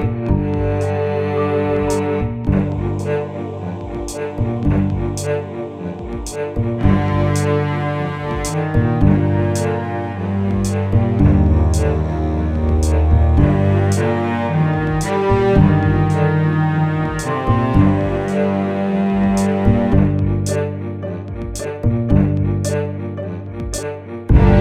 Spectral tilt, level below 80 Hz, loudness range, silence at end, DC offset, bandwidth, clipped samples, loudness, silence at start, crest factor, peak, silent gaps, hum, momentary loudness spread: -7.5 dB/octave; -26 dBFS; 5 LU; 0 s; under 0.1%; 13.5 kHz; under 0.1%; -18 LUFS; 0 s; 16 dB; 0 dBFS; none; none; 11 LU